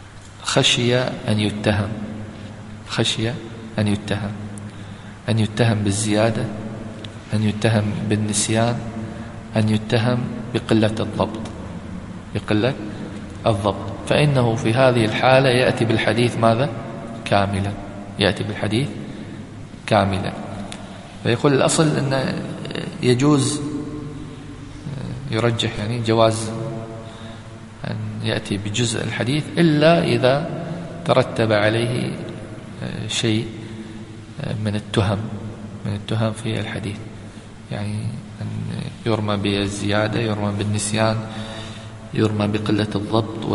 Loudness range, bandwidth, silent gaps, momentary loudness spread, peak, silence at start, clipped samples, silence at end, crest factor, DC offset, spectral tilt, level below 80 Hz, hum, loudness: 7 LU; 11.5 kHz; none; 17 LU; 0 dBFS; 0 s; under 0.1%; 0 s; 20 dB; under 0.1%; -5.5 dB/octave; -44 dBFS; none; -21 LUFS